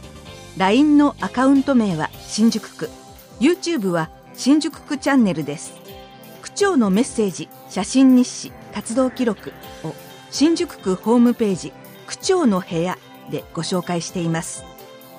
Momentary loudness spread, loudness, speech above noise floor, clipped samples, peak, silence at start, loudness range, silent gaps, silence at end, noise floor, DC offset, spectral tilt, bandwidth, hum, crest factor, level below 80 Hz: 17 LU; -19 LUFS; 21 dB; under 0.1%; -4 dBFS; 0 s; 3 LU; none; 0 s; -40 dBFS; under 0.1%; -5 dB/octave; 15.5 kHz; none; 16 dB; -52 dBFS